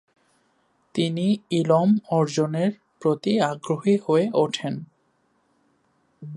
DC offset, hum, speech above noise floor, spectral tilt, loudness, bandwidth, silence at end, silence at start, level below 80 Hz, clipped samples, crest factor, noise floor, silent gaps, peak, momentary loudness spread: under 0.1%; none; 45 dB; -6.5 dB/octave; -23 LUFS; 11 kHz; 0 s; 0.95 s; -70 dBFS; under 0.1%; 18 dB; -67 dBFS; none; -6 dBFS; 9 LU